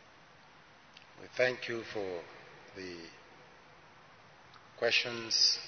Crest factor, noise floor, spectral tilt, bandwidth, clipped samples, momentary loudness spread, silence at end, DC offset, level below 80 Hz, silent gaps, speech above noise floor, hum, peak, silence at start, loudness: 24 dB; -59 dBFS; -1.5 dB/octave; 6.6 kHz; under 0.1%; 26 LU; 0 s; under 0.1%; -76 dBFS; none; 25 dB; none; -14 dBFS; 0.95 s; -33 LUFS